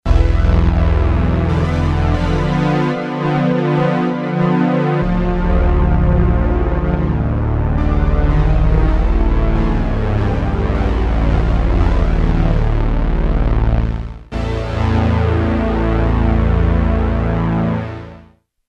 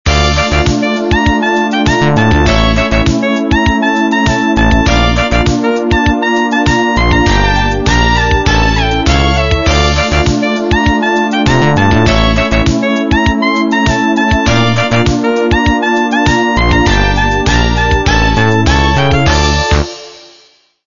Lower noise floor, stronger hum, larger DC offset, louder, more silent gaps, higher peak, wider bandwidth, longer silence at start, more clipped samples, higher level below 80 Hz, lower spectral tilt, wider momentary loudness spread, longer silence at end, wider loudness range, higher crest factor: about the same, -46 dBFS vs -47 dBFS; neither; neither; second, -16 LUFS vs -10 LUFS; neither; about the same, 0 dBFS vs 0 dBFS; about the same, 6.8 kHz vs 7.4 kHz; about the same, 0.05 s vs 0.05 s; neither; about the same, -16 dBFS vs -18 dBFS; first, -9 dB/octave vs -5.5 dB/octave; about the same, 4 LU vs 2 LU; second, 0.5 s vs 0.7 s; about the same, 2 LU vs 1 LU; about the same, 14 dB vs 10 dB